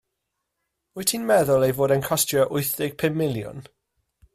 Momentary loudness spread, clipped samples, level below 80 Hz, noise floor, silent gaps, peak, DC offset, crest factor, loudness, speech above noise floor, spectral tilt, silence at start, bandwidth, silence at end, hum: 13 LU; under 0.1%; -58 dBFS; -80 dBFS; none; -6 dBFS; under 0.1%; 18 dB; -22 LUFS; 58 dB; -4.5 dB/octave; 0.95 s; 16 kHz; 0.75 s; none